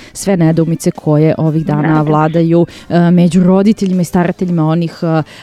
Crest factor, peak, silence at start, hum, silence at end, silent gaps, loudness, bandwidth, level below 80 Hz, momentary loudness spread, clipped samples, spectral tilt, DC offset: 10 dB; 0 dBFS; 0 s; none; 0 s; none; -12 LUFS; 13.5 kHz; -44 dBFS; 6 LU; under 0.1%; -7.5 dB/octave; under 0.1%